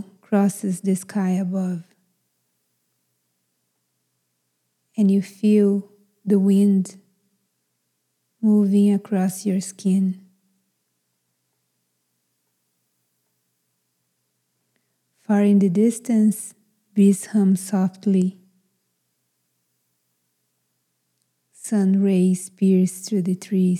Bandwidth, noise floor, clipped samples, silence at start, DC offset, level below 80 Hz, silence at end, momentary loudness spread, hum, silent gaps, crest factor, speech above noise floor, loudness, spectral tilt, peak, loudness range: 13 kHz; -73 dBFS; under 0.1%; 0 s; under 0.1%; under -90 dBFS; 0 s; 10 LU; 60 Hz at -55 dBFS; none; 16 dB; 55 dB; -20 LUFS; -7.5 dB/octave; -6 dBFS; 9 LU